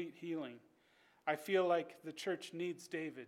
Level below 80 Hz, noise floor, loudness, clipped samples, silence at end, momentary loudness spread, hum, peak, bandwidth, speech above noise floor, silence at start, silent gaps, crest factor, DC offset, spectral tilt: under -90 dBFS; -71 dBFS; -40 LUFS; under 0.1%; 0 s; 13 LU; none; -22 dBFS; 16.5 kHz; 32 dB; 0 s; none; 20 dB; under 0.1%; -5 dB/octave